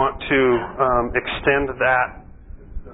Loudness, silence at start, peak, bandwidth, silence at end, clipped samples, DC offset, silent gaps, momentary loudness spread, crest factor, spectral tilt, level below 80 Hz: -19 LUFS; 0 s; -2 dBFS; 4 kHz; 0 s; under 0.1%; under 0.1%; none; 8 LU; 18 dB; -10.5 dB/octave; -38 dBFS